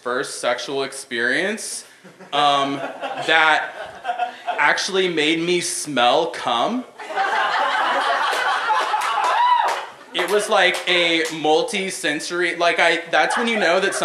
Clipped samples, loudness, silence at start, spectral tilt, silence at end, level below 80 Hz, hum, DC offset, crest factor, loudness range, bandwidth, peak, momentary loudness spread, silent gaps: under 0.1%; -19 LUFS; 0.05 s; -2 dB/octave; 0 s; -74 dBFS; none; under 0.1%; 20 dB; 2 LU; 14 kHz; 0 dBFS; 10 LU; none